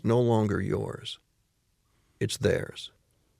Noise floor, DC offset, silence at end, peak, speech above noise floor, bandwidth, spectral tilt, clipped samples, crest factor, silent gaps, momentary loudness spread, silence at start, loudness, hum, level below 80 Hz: -72 dBFS; under 0.1%; 0.55 s; -10 dBFS; 45 dB; 14.5 kHz; -6 dB/octave; under 0.1%; 18 dB; none; 18 LU; 0.05 s; -28 LUFS; none; -58 dBFS